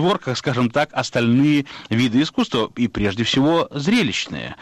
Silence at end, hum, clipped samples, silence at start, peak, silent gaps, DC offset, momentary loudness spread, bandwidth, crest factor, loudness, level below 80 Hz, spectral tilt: 0.05 s; none; under 0.1%; 0 s; -8 dBFS; none; under 0.1%; 6 LU; 11 kHz; 12 dB; -19 LUFS; -48 dBFS; -5.5 dB/octave